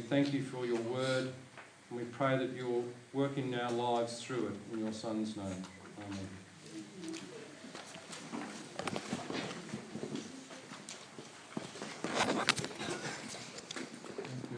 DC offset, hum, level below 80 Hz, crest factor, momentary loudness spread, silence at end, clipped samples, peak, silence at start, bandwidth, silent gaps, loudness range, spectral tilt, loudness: under 0.1%; none; -80 dBFS; 34 dB; 15 LU; 0 s; under 0.1%; -6 dBFS; 0 s; 10.5 kHz; none; 8 LU; -4.5 dB/octave; -39 LUFS